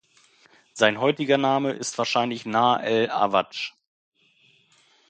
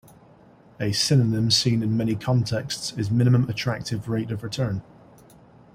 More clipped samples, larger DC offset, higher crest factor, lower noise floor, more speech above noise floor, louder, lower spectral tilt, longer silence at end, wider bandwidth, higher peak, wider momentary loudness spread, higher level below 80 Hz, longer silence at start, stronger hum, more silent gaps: neither; neither; first, 24 dB vs 18 dB; first, -61 dBFS vs -52 dBFS; first, 38 dB vs 29 dB; about the same, -23 LUFS vs -23 LUFS; about the same, -4 dB/octave vs -5 dB/octave; first, 1.4 s vs 0.95 s; second, 9.4 kHz vs 15.5 kHz; first, -2 dBFS vs -6 dBFS; about the same, 10 LU vs 9 LU; second, -70 dBFS vs -54 dBFS; about the same, 0.75 s vs 0.8 s; neither; neither